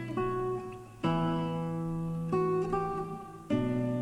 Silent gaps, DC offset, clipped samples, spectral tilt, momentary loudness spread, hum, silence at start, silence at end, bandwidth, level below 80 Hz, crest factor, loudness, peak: none; under 0.1%; under 0.1%; -8 dB/octave; 8 LU; none; 0 s; 0 s; 11.5 kHz; -52 dBFS; 14 dB; -33 LUFS; -18 dBFS